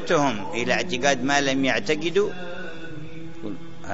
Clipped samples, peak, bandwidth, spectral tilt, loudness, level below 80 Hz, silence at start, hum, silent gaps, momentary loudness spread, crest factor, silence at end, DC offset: under 0.1%; -4 dBFS; 8 kHz; -4 dB/octave; -23 LUFS; -56 dBFS; 0 s; none; none; 17 LU; 20 dB; 0 s; 3%